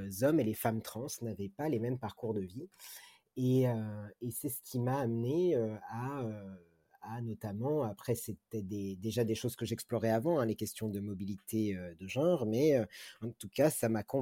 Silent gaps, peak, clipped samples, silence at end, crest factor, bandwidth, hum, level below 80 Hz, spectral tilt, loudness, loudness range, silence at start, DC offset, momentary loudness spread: none; -16 dBFS; under 0.1%; 0 s; 20 dB; 16.5 kHz; none; -70 dBFS; -6.5 dB/octave; -35 LUFS; 4 LU; 0 s; under 0.1%; 13 LU